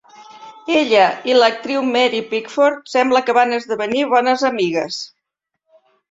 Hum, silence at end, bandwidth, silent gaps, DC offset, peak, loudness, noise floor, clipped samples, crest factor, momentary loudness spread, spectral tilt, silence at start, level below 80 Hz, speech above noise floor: none; 1.05 s; 7.8 kHz; none; under 0.1%; 0 dBFS; -16 LUFS; -78 dBFS; under 0.1%; 18 dB; 8 LU; -3.5 dB/octave; 0.2 s; -66 dBFS; 62 dB